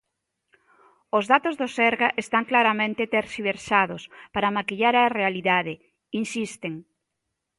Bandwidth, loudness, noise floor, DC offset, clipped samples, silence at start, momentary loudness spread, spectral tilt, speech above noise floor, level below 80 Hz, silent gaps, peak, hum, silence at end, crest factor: 11.5 kHz; -23 LUFS; -81 dBFS; under 0.1%; under 0.1%; 1.15 s; 14 LU; -4.5 dB/octave; 57 dB; -64 dBFS; none; -2 dBFS; none; 0.75 s; 22 dB